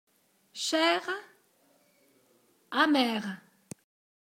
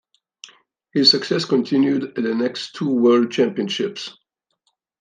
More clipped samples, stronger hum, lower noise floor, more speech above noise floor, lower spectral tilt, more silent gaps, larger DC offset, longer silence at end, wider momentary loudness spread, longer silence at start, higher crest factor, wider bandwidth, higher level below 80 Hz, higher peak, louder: neither; neither; second, -67 dBFS vs -71 dBFS; second, 39 dB vs 52 dB; second, -3 dB/octave vs -5 dB/octave; neither; neither; about the same, 0.85 s vs 0.9 s; first, 25 LU vs 12 LU; second, 0.55 s vs 0.95 s; first, 24 dB vs 18 dB; first, 16.5 kHz vs 9.6 kHz; second, -82 dBFS vs -72 dBFS; second, -10 dBFS vs -2 dBFS; second, -28 LUFS vs -19 LUFS